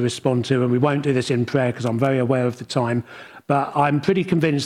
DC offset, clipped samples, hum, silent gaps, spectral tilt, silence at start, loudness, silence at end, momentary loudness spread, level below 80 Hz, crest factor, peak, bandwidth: under 0.1%; under 0.1%; none; none; -6.5 dB/octave; 0 s; -21 LUFS; 0 s; 5 LU; -60 dBFS; 14 dB; -6 dBFS; 12.5 kHz